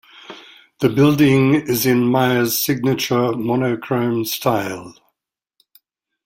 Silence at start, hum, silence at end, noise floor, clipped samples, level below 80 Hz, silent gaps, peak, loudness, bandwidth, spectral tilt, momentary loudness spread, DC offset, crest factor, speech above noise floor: 0.3 s; none; 1.35 s; -80 dBFS; under 0.1%; -54 dBFS; none; -2 dBFS; -17 LUFS; 16.5 kHz; -5.5 dB/octave; 12 LU; under 0.1%; 16 dB; 63 dB